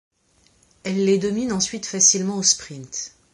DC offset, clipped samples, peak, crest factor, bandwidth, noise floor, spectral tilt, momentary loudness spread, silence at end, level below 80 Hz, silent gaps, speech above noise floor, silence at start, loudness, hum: under 0.1%; under 0.1%; -2 dBFS; 20 dB; 11.5 kHz; -60 dBFS; -2.5 dB/octave; 16 LU; 0.25 s; -58 dBFS; none; 39 dB; 0.85 s; -19 LUFS; none